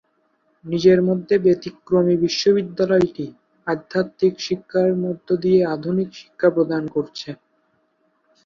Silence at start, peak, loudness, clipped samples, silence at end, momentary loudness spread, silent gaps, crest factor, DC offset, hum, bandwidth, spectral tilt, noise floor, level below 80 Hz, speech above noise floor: 0.65 s; -4 dBFS; -20 LUFS; under 0.1%; 1.1 s; 13 LU; none; 18 dB; under 0.1%; none; 7.2 kHz; -6.5 dB/octave; -66 dBFS; -58 dBFS; 46 dB